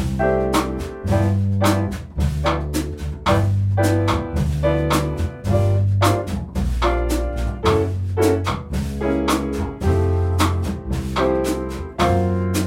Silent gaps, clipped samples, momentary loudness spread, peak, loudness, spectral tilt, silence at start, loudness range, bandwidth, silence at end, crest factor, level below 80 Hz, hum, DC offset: none; under 0.1%; 7 LU; -4 dBFS; -20 LUFS; -6.5 dB/octave; 0 s; 1 LU; 16.5 kHz; 0 s; 14 dB; -28 dBFS; none; under 0.1%